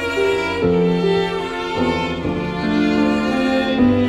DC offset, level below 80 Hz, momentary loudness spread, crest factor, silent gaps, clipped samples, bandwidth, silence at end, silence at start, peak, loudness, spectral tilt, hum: under 0.1%; -40 dBFS; 6 LU; 12 dB; none; under 0.1%; 12.5 kHz; 0 s; 0 s; -6 dBFS; -18 LUFS; -6.5 dB/octave; none